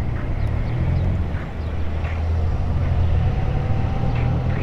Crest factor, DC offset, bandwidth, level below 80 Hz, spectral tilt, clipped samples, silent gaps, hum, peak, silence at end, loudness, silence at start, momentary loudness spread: 12 dB; under 0.1%; 6.2 kHz; -26 dBFS; -9 dB/octave; under 0.1%; none; none; -8 dBFS; 0 s; -23 LUFS; 0 s; 6 LU